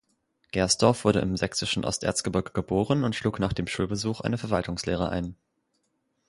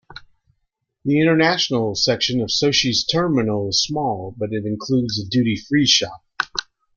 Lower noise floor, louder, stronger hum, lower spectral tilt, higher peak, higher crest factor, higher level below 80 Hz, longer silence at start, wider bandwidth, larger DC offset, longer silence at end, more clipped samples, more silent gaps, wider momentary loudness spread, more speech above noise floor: about the same, -75 dBFS vs -73 dBFS; second, -27 LUFS vs -19 LUFS; neither; about the same, -4.5 dB/octave vs -4 dB/octave; second, -6 dBFS vs 0 dBFS; about the same, 22 dB vs 20 dB; first, -46 dBFS vs -52 dBFS; first, 0.55 s vs 0.1 s; first, 11.5 kHz vs 7.4 kHz; neither; first, 0.95 s vs 0.35 s; neither; neither; about the same, 8 LU vs 10 LU; second, 48 dB vs 54 dB